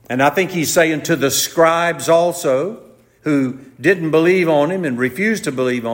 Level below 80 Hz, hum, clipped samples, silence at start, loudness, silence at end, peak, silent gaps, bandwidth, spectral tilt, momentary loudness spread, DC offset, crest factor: -60 dBFS; none; under 0.1%; 0.1 s; -16 LUFS; 0 s; -2 dBFS; none; 16.5 kHz; -4 dB/octave; 6 LU; under 0.1%; 14 dB